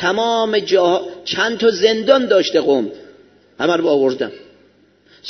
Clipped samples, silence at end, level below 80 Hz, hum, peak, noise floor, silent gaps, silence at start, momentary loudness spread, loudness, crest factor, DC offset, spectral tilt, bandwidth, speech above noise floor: under 0.1%; 0 s; -62 dBFS; 50 Hz at -55 dBFS; 0 dBFS; -53 dBFS; none; 0 s; 9 LU; -16 LUFS; 16 dB; under 0.1%; -4 dB/octave; 6.4 kHz; 37 dB